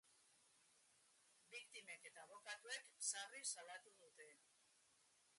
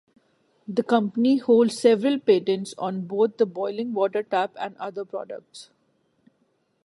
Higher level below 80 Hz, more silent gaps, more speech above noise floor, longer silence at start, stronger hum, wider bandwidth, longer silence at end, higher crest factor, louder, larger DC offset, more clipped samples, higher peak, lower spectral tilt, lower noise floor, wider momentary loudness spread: second, under -90 dBFS vs -78 dBFS; neither; second, 24 dB vs 46 dB; second, 0.05 s vs 0.7 s; neither; about the same, 11.5 kHz vs 11.5 kHz; second, 0 s vs 1.25 s; first, 26 dB vs 20 dB; second, -52 LUFS vs -23 LUFS; neither; neither; second, -32 dBFS vs -4 dBFS; second, 2.5 dB/octave vs -6 dB/octave; first, -78 dBFS vs -69 dBFS; first, 19 LU vs 15 LU